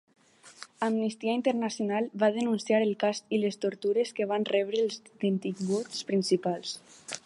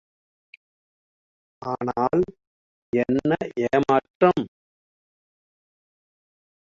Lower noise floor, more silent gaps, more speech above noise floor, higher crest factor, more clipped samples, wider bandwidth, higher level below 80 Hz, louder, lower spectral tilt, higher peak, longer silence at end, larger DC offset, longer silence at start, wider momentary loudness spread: second, -51 dBFS vs under -90 dBFS; second, none vs 2.47-2.93 s, 4.10-4.20 s; second, 22 dB vs over 68 dB; about the same, 18 dB vs 22 dB; neither; first, 11.5 kHz vs 7.4 kHz; second, -80 dBFS vs -58 dBFS; second, -29 LUFS vs -23 LUFS; second, -5 dB/octave vs -7.5 dB/octave; second, -12 dBFS vs -4 dBFS; second, 0.05 s vs 2.25 s; neither; second, 0.45 s vs 1.6 s; second, 6 LU vs 10 LU